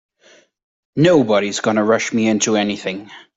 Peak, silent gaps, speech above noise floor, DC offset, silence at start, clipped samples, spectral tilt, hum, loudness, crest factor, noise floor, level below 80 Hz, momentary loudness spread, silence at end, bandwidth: -2 dBFS; none; 35 dB; under 0.1%; 0.95 s; under 0.1%; -4.5 dB/octave; none; -16 LUFS; 16 dB; -52 dBFS; -58 dBFS; 12 LU; 0.2 s; 8 kHz